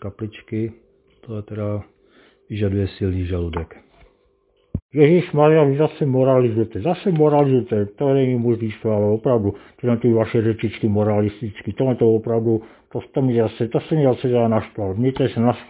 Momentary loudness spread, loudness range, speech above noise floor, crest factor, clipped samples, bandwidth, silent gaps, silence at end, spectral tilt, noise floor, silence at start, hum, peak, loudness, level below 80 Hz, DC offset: 15 LU; 9 LU; 43 dB; 18 dB; under 0.1%; 4 kHz; 4.82-4.89 s; 0.05 s; -12.5 dB/octave; -61 dBFS; 0 s; none; -2 dBFS; -19 LUFS; -42 dBFS; under 0.1%